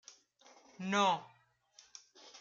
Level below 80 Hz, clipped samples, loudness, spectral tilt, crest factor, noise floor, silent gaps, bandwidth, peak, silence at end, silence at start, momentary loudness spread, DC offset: -88 dBFS; under 0.1%; -34 LUFS; -3.5 dB/octave; 22 dB; -66 dBFS; none; 7.6 kHz; -18 dBFS; 0 s; 0.8 s; 25 LU; under 0.1%